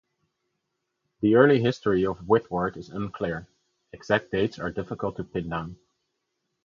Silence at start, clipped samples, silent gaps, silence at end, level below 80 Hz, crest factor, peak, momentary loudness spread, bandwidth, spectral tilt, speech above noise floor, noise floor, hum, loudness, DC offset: 1.2 s; under 0.1%; none; 0.9 s; -54 dBFS; 24 dB; -4 dBFS; 14 LU; 7.4 kHz; -7.5 dB/octave; 55 dB; -80 dBFS; none; -25 LUFS; under 0.1%